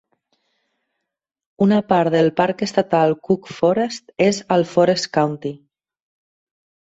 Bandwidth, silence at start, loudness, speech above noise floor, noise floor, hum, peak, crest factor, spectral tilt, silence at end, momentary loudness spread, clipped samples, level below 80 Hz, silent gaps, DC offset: 8 kHz; 1.6 s; -18 LUFS; 60 dB; -77 dBFS; none; -2 dBFS; 18 dB; -6 dB/octave; 1.35 s; 6 LU; under 0.1%; -60 dBFS; none; under 0.1%